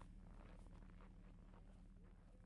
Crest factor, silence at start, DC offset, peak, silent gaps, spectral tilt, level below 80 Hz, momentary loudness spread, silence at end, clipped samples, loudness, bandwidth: 14 dB; 0 s; under 0.1%; -48 dBFS; none; -7 dB/octave; -62 dBFS; 3 LU; 0 s; under 0.1%; -65 LUFS; 10.5 kHz